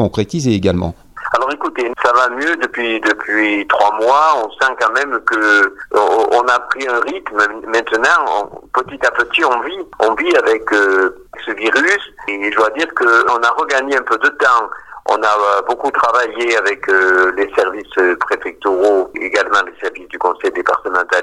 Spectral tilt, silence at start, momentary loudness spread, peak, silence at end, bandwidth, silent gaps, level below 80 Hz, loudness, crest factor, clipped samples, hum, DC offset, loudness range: -4.5 dB/octave; 0 s; 7 LU; 0 dBFS; 0 s; 12 kHz; none; -48 dBFS; -14 LUFS; 14 dB; under 0.1%; none; under 0.1%; 2 LU